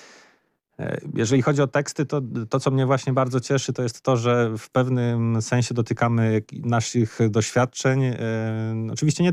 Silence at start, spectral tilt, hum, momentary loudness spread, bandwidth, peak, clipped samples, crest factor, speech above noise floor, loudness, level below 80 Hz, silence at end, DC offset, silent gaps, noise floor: 0 s; -6 dB/octave; none; 6 LU; 11.5 kHz; -10 dBFS; under 0.1%; 12 dB; 42 dB; -23 LUFS; -60 dBFS; 0 s; under 0.1%; none; -64 dBFS